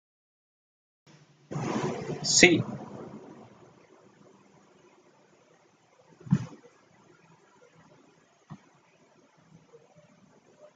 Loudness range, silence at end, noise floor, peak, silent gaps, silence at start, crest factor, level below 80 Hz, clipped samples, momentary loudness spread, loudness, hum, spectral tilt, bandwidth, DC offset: 12 LU; 2.2 s; -63 dBFS; -2 dBFS; none; 1.5 s; 32 dB; -66 dBFS; under 0.1%; 32 LU; -25 LUFS; none; -3 dB/octave; 10 kHz; under 0.1%